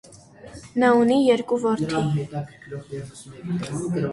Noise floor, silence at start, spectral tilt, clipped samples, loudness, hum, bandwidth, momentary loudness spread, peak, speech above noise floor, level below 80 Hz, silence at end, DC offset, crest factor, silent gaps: -45 dBFS; 0.1 s; -6.5 dB/octave; under 0.1%; -22 LUFS; none; 11.5 kHz; 20 LU; -6 dBFS; 23 dB; -56 dBFS; 0 s; under 0.1%; 16 dB; none